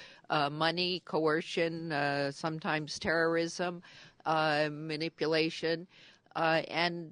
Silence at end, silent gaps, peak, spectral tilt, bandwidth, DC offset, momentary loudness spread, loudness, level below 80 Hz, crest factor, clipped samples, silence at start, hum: 0 s; none; -12 dBFS; -4.5 dB/octave; 10.5 kHz; under 0.1%; 7 LU; -32 LUFS; -70 dBFS; 20 dB; under 0.1%; 0 s; none